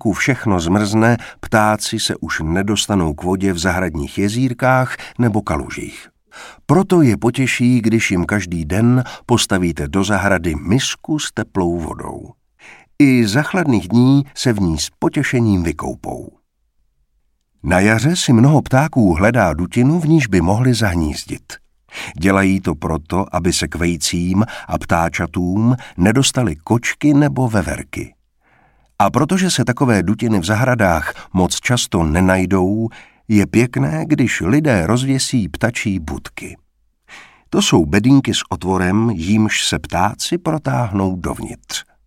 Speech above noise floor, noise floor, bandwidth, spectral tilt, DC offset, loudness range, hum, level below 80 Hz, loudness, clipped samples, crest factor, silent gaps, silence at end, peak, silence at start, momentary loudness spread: 47 dB; -63 dBFS; 16 kHz; -5.5 dB/octave; under 0.1%; 3 LU; none; -36 dBFS; -16 LUFS; under 0.1%; 16 dB; none; 0.25 s; 0 dBFS; 0.05 s; 11 LU